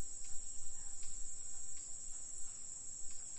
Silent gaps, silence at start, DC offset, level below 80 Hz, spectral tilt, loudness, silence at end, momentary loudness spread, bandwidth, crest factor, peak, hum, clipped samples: none; 0 s; under 0.1%; -54 dBFS; -0.5 dB/octave; -46 LUFS; 0 s; 1 LU; 10.5 kHz; 12 dB; -26 dBFS; none; under 0.1%